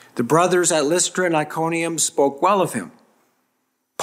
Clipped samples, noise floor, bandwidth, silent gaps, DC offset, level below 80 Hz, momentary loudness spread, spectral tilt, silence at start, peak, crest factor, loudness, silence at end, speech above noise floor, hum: under 0.1%; -71 dBFS; 16 kHz; none; under 0.1%; -70 dBFS; 8 LU; -3.5 dB/octave; 0.15 s; -2 dBFS; 18 dB; -19 LUFS; 0 s; 52 dB; none